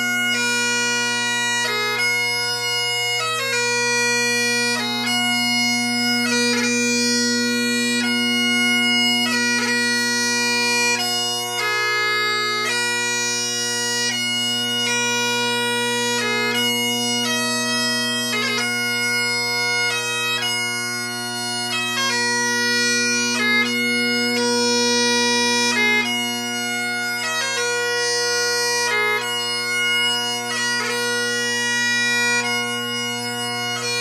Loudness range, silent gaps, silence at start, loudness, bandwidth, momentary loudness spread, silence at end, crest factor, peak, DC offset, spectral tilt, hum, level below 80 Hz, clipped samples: 2 LU; none; 0 s; -18 LUFS; 15.5 kHz; 4 LU; 0 s; 14 dB; -6 dBFS; under 0.1%; -1 dB/octave; none; -72 dBFS; under 0.1%